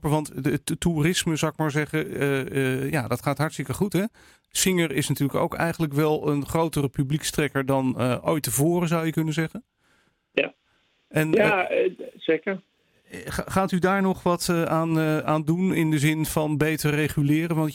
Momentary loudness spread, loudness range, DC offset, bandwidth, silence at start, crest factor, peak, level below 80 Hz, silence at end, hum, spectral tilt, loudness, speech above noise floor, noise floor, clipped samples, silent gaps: 6 LU; 3 LU; under 0.1%; 17 kHz; 0.05 s; 20 dB; -6 dBFS; -50 dBFS; 0 s; none; -5.5 dB/octave; -24 LUFS; 43 dB; -67 dBFS; under 0.1%; none